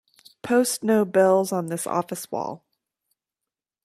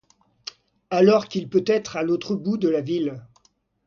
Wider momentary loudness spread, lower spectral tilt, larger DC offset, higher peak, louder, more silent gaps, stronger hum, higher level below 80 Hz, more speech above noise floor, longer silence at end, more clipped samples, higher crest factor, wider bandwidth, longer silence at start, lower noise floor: second, 14 LU vs 21 LU; second, -4.5 dB/octave vs -6.5 dB/octave; neither; about the same, -6 dBFS vs -4 dBFS; about the same, -23 LUFS vs -22 LUFS; neither; neither; second, -70 dBFS vs -64 dBFS; first, 66 dB vs 42 dB; first, 1.3 s vs 0.65 s; neither; about the same, 18 dB vs 18 dB; first, 15.5 kHz vs 7.2 kHz; second, 0.45 s vs 0.9 s; first, -88 dBFS vs -63 dBFS